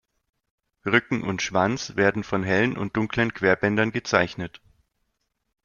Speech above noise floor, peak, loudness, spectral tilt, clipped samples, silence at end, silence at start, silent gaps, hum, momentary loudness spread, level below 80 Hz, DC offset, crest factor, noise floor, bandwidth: 53 dB; -4 dBFS; -23 LUFS; -5 dB/octave; under 0.1%; 1.15 s; 0.85 s; none; none; 6 LU; -56 dBFS; under 0.1%; 22 dB; -76 dBFS; 7.2 kHz